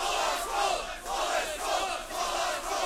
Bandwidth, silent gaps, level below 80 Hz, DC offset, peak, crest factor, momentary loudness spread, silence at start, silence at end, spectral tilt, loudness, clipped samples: 16.5 kHz; none; -50 dBFS; under 0.1%; -16 dBFS; 16 dB; 4 LU; 0 s; 0 s; -0.5 dB/octave; -30 LUFS; under 0.1%